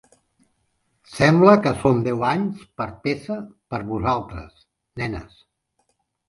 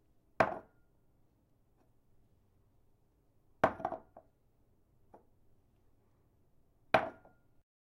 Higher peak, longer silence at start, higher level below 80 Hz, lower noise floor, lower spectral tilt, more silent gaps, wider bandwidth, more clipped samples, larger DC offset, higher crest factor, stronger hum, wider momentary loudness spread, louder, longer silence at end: first, 0 dBFS vs -10 dBFS; first, 1.1 s vs 0.4 s; first, -48 dBFS vs -68 dBFS; about the same, -71 dBFS vs -71 dBFS; about the same, -7 dB/octave vs -6 dB/octave; neither; second, 11.5 kHz vs 15.5 kHz; neither; neither; second, 22 dB vs 32 dB; neither; first, 20 LU vs 14 LU; first, -21 LUFS vs -35 LUFS; first, 1.05 s vs 0.7 s